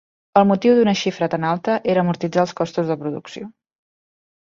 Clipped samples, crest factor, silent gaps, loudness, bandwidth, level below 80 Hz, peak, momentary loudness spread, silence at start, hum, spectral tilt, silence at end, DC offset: under 0.1%; 18 dB; none; -19 LUFS; 7.4 kHz; -60 dBFS; -2 dBFS; 15 LU; 0.35 s; none; -6.5 dB/octave; 0.9 s; under 0.1%